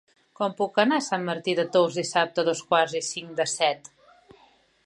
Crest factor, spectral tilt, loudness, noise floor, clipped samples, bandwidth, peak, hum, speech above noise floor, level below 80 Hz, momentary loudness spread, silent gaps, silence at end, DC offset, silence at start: 20 dB; -3.5 dB/octave; -25 LUFS; -60 dBFS; under 0.1%; 11.5 kHz; -6 dBFS; none; 35 dB; -76 dBFS; 8 LU; none; 1 s; under 0.1%; 0.4 s